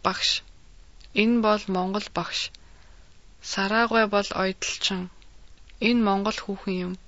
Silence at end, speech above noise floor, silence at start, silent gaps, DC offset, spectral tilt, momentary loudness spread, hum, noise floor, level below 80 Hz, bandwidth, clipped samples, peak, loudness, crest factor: 0.1 s; 27 dB; 0 s; none; 0.3%; -4 dB/octave; 10 LU; none; -52 dBFS; -52 dBFS; 8 kHz; under 0.1%; -6 dBFS; -25 LUFS; 20 dB